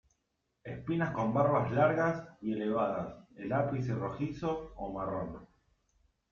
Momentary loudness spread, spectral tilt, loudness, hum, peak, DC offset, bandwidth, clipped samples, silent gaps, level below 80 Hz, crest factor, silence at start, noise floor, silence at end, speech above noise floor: 15 LU; -8.5 dB/octave; -33 LUFS; none; -14 dBFS; under 0.1%; 7 kHz; under 0.1%; none; -60 dBFS; 20 dB; 0.65 s; -81 dBFS; 0.85 s; 49 dB